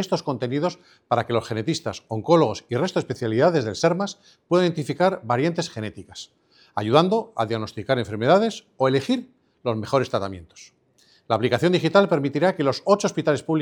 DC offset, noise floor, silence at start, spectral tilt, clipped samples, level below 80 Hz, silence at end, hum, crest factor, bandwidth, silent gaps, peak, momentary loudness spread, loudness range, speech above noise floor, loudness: under 0.1%; -60 dBFS; 0 s; -6 dB/octave; under 0.1%; -62 dBFS; 0 s; none; 22 dB; 17.5 kHz; none; 0 dBFS; 11 LU; 2 LU; 37 dB; -22 LUFS